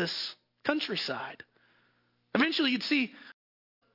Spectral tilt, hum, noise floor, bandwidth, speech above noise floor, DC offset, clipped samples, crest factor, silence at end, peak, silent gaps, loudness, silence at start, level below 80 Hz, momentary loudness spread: -4.5 dB/octave; none; -71 dBFS; 5.8 kHz; 41 dB; under 0.1%; under 0.1%; 24 dB; 0.65 s; -10 dBFS; none; -30 LUFS; 0 s; -76 dBFS; 12 LU